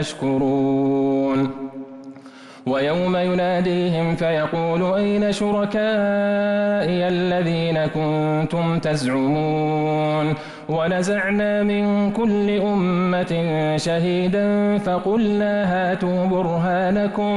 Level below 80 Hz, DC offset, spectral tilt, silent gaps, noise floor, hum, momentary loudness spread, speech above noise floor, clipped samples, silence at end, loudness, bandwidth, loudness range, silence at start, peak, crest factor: -50 dBFS; under 0.1%; -7 dB/octave; none; -41 dBFS; none; 2 LU; 22 dB; under 0.1%; 0 s; -20 LUFS; 11.5 kHz; 2 LU; 0 s; -12 dBFS; 8 dB